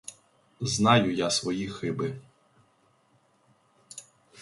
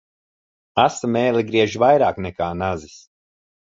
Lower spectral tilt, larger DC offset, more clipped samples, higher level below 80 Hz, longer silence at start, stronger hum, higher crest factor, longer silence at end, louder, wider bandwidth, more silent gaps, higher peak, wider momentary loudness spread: about the same, -4.5 dB/octave vs -5.5 dB/octave; neither; neither; second, -62 dBFS vs -48 dBFS; second, 0.1 s vs 0.75 s; neither; about the same, 24 dB vs 20 dB; second, 0 s vs 0.65 s; second, -26 LUFS vs -19 LUFS; first, 11.5 kHz vs 7.8 kHz; neither; second, -6 dBFS vs -2 dBFS; first, 24 LU vs 10 LU